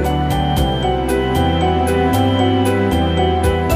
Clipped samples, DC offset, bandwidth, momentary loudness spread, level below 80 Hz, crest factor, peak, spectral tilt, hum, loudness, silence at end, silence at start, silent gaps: under 0.1%; under 0.1%; 16 kHz; 2 LU; -24 dBFS; 12 dB; -2 dBFS; -6.5 dB/octave; none; -16 LUFS; 0 s; 0 s; none